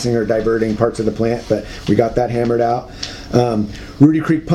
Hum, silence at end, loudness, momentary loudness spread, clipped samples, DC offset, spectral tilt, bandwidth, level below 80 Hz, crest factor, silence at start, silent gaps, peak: none; 0 s; -17 LUFS; 9 LU; under 0.1%; under 0.1%; -7 dB/octave; 12.5 kHz; -38 dBFS; 16 dB; 0 s; none; 0 dBFS